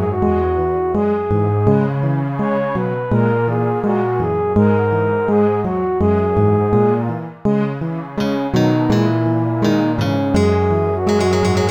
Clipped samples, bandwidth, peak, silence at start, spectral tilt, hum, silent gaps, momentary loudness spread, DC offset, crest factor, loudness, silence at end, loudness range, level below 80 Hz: under 0.1%; 9.8 kHz; -2 dBFS; 0 s; -8 dB/octave; none; none; 4 LU; 0.2%; 14 dB; -17 LUFS; 0 s; 1 LU; -40 dBFS